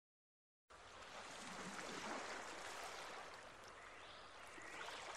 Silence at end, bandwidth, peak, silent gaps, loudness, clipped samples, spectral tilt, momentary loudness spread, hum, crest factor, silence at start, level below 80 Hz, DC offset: 0 s; 13 kHz; -36 dBFS; none; -52 LUFS; under 0.1%; -2 dB/octave; 9 LU; none; 18 dB; 0.7 s; -78 dBFS; under 0.1%